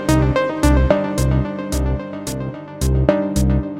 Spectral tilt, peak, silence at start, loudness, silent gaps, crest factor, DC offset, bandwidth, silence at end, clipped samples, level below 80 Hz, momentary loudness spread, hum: -6.5 dB/octave; 0 dBFS; 0 s; -19 LUFS; none; 18 dB; 0.2%; 16 kHz; 0 s; under 0.1%; -22 dBFS; 10 LU; none